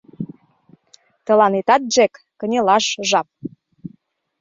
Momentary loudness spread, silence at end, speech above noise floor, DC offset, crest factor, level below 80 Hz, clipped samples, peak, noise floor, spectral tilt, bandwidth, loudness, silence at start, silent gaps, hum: 24 LU; 0.55 s; 38 dB; under 0.1%; 18 dB; -66 dBFS; under 0.1%; -2 dBFS; -55 dBFS; -3 dB/octave; 7.8 kHz; -17 LUFS; 0.2 s; none; none